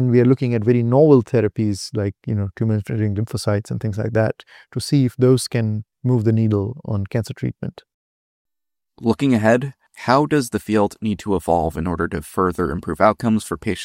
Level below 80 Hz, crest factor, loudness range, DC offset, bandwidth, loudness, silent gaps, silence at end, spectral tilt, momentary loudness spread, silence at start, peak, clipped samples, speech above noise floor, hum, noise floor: -48 dBFS; 18 dB; 4 LU; under 0.1%; 16 kHz; -19 LUFS; 7.94-8.45 s; 0 s; -7 dB/octave; 10 LU; 0 s; -2 dBFS; under 0.1%; 70 dB; none; -88 dBFS